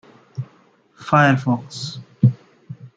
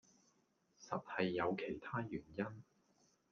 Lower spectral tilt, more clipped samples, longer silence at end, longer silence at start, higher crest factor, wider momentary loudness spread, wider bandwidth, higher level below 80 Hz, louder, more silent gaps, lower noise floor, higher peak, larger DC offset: about the same, -6.5 dB/octave vs -6.5 dB/octave; neither; second, 0.1 s vs 0.7 s; second, 0.35 s vs 0.8 s; about the same, 20 dB vs 22 dB; first, 23 LU vs 9 LU; first, 7.8 kHz vs 7 kHz; first, -58 dBFS vs -76 dBFS; first, -19 LUFS vs -43 LUFS; neither; second, -55 dBFS vs -78 dBFS; first, -2 dBFS vs -22 dBFS; neither